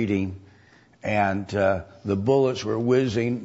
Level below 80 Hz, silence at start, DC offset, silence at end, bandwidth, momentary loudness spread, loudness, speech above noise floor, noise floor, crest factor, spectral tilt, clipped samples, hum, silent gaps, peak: -56 dBFS; 0 s; under 0.1%; 0 s; 8 kHz; 9 LU; -24 LUFS; 32 dB; -55 dBFS; 16 dB; -7 dB/octave; under 0.1%; none; none; -8 dBFS